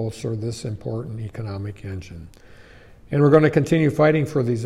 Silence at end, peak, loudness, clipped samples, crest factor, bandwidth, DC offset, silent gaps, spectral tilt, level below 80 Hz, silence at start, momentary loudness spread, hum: 0 s; -2 dBFS; -21 LUFS; under 0.1%; 18 dB; 12.5 kHz; under 0.1%; none; -7.5 dB/octave; -50 dBFS; 0 s; 18 LU; none